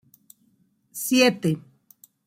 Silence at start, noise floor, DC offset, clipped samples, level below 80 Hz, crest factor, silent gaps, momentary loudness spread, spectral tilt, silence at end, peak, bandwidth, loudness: 0.95 s; -65 dBFS; under 0.1%; under 0.1%; -70 dBFS; 20 dB; none; 14 LU; -4 dB/octave; 0.65 s; -6 dBFS; 16.5 kHz; -22 LUFS